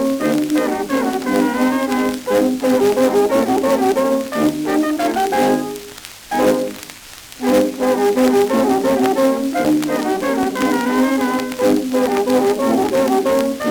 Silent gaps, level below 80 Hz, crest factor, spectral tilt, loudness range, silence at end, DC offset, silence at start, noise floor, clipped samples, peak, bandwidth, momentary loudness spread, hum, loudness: none; -50 dBFS; 14 dB; -4.5 dB/octave; 2 LU; 0 s; under 0.1%; 0 s; -37 dBFS; under 0.1%; -2 dBFS; over 20 kHz; 5 LU; none; -17 LUFS